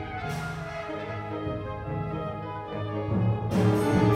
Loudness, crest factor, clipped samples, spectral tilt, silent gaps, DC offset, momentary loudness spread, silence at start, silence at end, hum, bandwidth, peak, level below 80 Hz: -30 LUFS; 18 dB; under 0.1%; -7.5 dB/octave; none; under 0.1%; 11 LU; 0 s; 0 s; none; 15 kHz; -8 dBFS; -48 dBFS